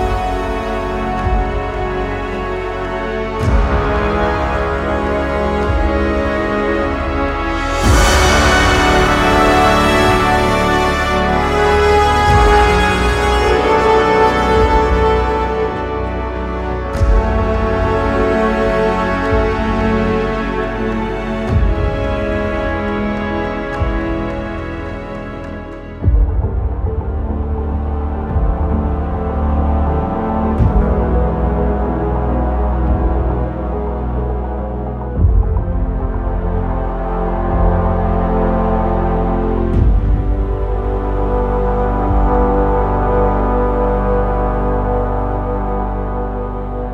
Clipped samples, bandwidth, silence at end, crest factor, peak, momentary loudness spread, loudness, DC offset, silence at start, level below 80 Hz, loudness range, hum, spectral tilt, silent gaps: under 0.1%; 14 kHz; 0 s; 14 dB; 0 dBFS; 9 LU; -16 LUFS; under 0.1%; 0 s; -20 dBFS; 7 LU; none; -6 dB/octave; none